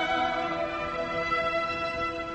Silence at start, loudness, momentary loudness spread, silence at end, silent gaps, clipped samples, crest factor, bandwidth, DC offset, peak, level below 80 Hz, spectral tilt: 0 s; -29 LUFS; 4 LU; 0 s; none; under 0.1%; 14 dB; 8.4 kHz; under 0.1%; -16 dBFS; -52 dBFS; -4.5 dB/octave